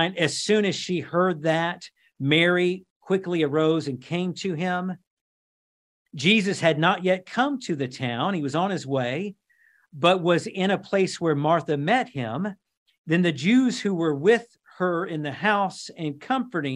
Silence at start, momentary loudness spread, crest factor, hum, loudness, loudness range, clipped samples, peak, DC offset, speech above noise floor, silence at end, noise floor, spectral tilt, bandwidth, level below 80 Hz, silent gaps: 0 s; 9 LU; 20 dB; none; -24 LUFS; 2 LU; under 0.1%; -4 dBFS; under 0.1%; 39 dB; 0 s; -62 dBFS; -5.5 dB/octave; 11.5 kHz; -72 dBFS; 2.90-3.01 s, 5.07-6.06 s, 12.77-12.86 s, 12.98-13.04 s